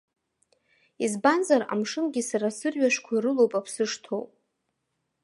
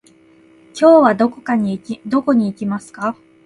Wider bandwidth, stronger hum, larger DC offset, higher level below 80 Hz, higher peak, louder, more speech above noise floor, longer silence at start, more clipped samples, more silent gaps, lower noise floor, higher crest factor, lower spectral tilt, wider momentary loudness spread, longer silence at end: about the same, 11.5 kHz vs 11.5 kHz; neither; neither; second, -80 dBFS vs -60 dBFS; second, -6 dBFS vs 0 dBFS; second, -26 LUFS vs -16 LUFS; first, 54 dB vs 34 dB; first, 1 s vs 0.75 s; neither; neither; first, -79 dBFS vs -49 dBFS; about the same, 20 dB vs 16 dB; second, -4 dB/octave vs -7 dB/octave; second, 9 LU vs 14 LU; first, 1 s vs 0.3 s